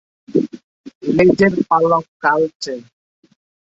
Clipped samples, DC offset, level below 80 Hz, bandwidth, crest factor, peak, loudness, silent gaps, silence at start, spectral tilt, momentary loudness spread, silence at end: under 0.1%; under 0.1%; -52 dBFS; 8 kHz; 16 dB; -2 dBFS; -16 LUFS; 0.64-0.84 s, 0.95-1.01 s, 2.08-2.20 s, 2.55-2.60 s; 0.3 s; -6.5 dB/octave; 15 LU; 0.95 s